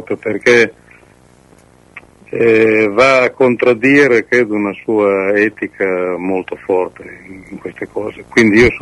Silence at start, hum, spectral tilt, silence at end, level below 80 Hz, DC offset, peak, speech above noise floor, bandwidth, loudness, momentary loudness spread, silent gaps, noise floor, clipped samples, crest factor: 0 s; none; -5.5 dB/octave; 0 s; -42 dBFS; under 0.1%; 0 dBFS; 33 dB; 11.5 kHz; -12 LUFS; 16 LU; none; -46 dBFS; under 0.1%; 14 dB